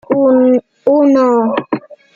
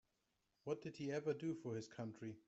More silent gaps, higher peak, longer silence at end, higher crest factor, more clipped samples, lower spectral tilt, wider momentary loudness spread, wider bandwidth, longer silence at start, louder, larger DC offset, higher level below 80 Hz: neither; first, -2 dBFS vs -30 dBFS; about the same, 0.2 s vs 0.1 s; second, 10 dB vs 18 dB; neither; about the same, -7.5 dB/octave vs -6.5 dB/octave; about the same, 10 LU vs 8 LU; second, 7.4 kHz vs 8.2 kHz; second, 0.1 s vs 0.65 s; first, -12 LUFS vs -47 LUFS; neither; first, -60 dBFS vs -84 dBFS